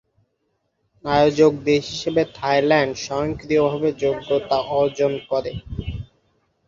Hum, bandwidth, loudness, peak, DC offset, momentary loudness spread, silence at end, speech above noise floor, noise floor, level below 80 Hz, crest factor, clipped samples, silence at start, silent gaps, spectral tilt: none; 7.6 kHz; -20 LUFS; -4 dBFS; under 0.1%; 14 LU; 0.65 s; 52 dB; -71 dBFS; -44 dBFS; 18 dB; under 0.1%; 1.05 s; none; -5.5 dB/octave